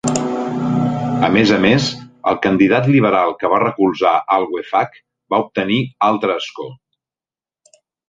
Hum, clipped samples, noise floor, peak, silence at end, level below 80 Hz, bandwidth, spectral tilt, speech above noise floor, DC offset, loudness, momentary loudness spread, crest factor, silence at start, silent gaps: none; under 0.1%; under -90 dBFS; 0 dBFS; 1.35 s; -52 dBFS; 9.4 kHz; -5.5 dB/octave; over 75 dB; under 0.1%; -16 LUFS; 9 LU; 16 dB; 0.05 s; none